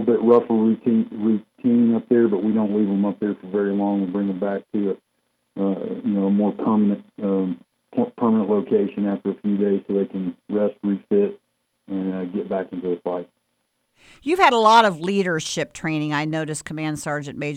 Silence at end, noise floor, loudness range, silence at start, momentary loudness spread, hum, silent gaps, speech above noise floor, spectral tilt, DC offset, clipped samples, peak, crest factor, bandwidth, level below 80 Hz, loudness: 0 s; -72 dBFS; 5 LU; 0 s; 11 LU; none; none; 51 dB; -6 dB/octave; under 0.1%; under 0.1%; -2 dBFS; 18 dB; 11 kHz; -64 dBFS; -21 LUFS